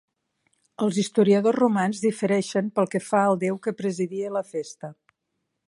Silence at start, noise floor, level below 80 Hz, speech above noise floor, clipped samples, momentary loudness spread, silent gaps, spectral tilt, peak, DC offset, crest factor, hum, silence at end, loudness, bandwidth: 0.8 s; -79 dBFS; -74 dBFS; 56 dB; under 0.1%; 12 LU; none; -6 dB/octave; -6 dBFS; under 0.1%; 18 dB; none; 0.75 s; -24 LUFS; 11.5 kHz